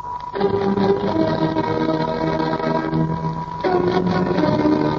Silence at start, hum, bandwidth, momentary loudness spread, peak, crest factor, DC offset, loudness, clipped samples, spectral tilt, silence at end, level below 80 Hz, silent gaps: 0 s; none; 7 kHz; 5 LU; -4 dBFS; 16 dB; under 0.1%; -20 LUFS; under 0.1%; -8 dB/octave; 0 s; -44 dBFS; none